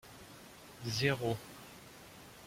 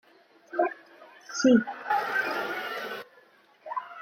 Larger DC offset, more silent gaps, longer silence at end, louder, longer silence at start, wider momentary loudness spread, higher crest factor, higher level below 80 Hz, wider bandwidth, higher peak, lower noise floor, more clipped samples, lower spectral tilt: neither; neither; about the same, 0 s vs 0 s; second, -36 LUFS vs -28 LUFS; second, 0.05 s vs 0.5 s; first, 20 LU vs 16 LU; about the same, 22 dB vs 20 dB; first, -66 dBFS vs -76 dBFS; about the same, 16.5 kHz vs 16.5 kHz; second, -18 dBFS vs -10 dBFS; second, -55 dBFS vs -59 dBFS; neither; about the same, -4.5 dB/octave vs -4 dB/octave